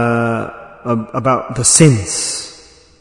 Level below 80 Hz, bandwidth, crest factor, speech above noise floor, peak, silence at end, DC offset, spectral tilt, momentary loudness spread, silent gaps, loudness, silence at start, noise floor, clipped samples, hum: -46 dBFS; 12 kHz; 16 dB; 29 dB; 0 dBFS; 0.45 s; under 0.1%; -4 dB/octave; 18 LU; none; -14 LUFS; 0 s; -42 dBFS; 0.3%; none